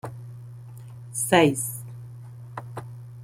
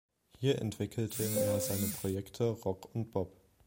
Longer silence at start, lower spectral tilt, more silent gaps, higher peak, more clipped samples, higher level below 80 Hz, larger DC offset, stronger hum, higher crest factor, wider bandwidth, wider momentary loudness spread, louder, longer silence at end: second, 0.05 s vs 0.4 s; about the same, -4.5 dB/octave vs -5.5 dB/octave; neither; first, -4 dBFS vs -18 dBFS; neither; about the same, -62 dBFS vs -64 dBFS; neither; neither; first, 24 dB vs 18 dB; about the same, 16.5 kHz vs 16.5 kHz; first, 23 LU vs 7 LU; first, -22 LUFS vs -35 LUFS; second, 0 s vs 0.35 s